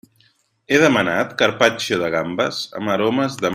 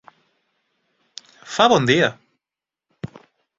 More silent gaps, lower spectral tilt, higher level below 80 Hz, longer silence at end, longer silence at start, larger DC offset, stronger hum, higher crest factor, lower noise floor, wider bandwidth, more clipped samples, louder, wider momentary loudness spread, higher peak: neither; about the same, -4.5 dB/octave vs -4.5 dB/octave; about the same, -58 dBFS vs -60 dBFS; second, 0 s vs 0.55 s; second, 0.7 s vs 1.45 s; neither; neither; about the same, 18 dB vs 22 dB; second, -60 dBFS vs -89 dBFS; first, 16 kHz vs 7.8 kHz; neither; about the same, -18 LUFS vs -17 LUFS; second, 7 LU vs 26 LU; about the same, 0 dBFS vs -2 dBFS